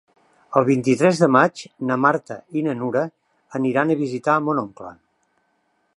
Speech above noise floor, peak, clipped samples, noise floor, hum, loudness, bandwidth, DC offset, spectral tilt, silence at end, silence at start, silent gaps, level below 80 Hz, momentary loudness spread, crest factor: 48 dB; -2 dBFS; under 0.1%; -68 dBFS; none; -20 LUFS; 11.5 kHz; under 0.1%; -6.5 dB/octave; 1.05 s; 0.5 s; none; -68 dBFS; 14 LU; 20 dB